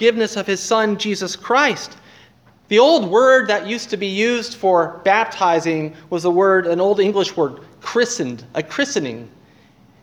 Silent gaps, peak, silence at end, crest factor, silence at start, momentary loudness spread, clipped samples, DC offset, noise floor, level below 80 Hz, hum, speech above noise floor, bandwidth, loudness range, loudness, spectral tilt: none; 0 dBFS; 0.75 s; 18 dB; 0 s; 11 LU; under 0.1%; under 0.1%; -50 dBFS; -64 dBFS; none; 33 dB; 13.5 kHz; 3 LU; -17 LUFS; -4 dB/octave